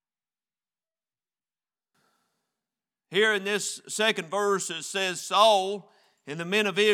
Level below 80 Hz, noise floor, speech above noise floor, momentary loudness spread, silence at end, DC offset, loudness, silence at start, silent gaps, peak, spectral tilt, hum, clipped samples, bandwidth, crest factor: under -90 dBFS; under -90 dBFS; over 65 dB; 12 LU; 0 s; under 0.1%; -25 LUFS; 3.1 s; none; -6 dBFS; -2 dB/octave; none; under 0.1%; 16.5 kHz; 22 dB